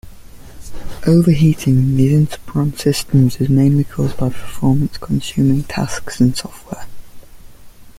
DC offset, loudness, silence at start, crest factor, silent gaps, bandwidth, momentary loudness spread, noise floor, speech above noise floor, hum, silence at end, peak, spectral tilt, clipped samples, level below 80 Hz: under 0.1%; -16 LUFS; 0.05 s; 14 dB; none; 16 kHz; 13 LU; -36 dBFS; 22 dB; none; 0 s; -2 dBFS; -7 dB/octave; under 0.1%; -36 dBFS